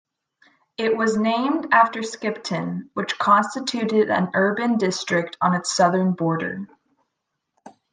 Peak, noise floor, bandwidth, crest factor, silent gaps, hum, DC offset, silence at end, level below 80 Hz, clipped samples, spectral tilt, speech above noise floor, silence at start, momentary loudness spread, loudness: -4 dBFS; -79 dBFS; 9.8 kHz; 18 dB; none; none; under 0.1%; 0.2 s; -70 dBFS; under 0.1%; -5 dB/octave; 58 dB; 0.8 s; 10 LU; -21 LUFS